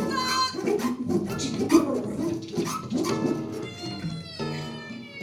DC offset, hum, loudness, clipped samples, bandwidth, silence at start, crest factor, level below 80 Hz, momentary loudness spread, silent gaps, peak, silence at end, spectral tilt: under 0.1%; none; -27 LUFS; under 0.1%; 16.5 kHz; 0 s; 22 dB; -58 dBFS; 12 LU; none; -6 dBFS; 0 s; -5 dB/octave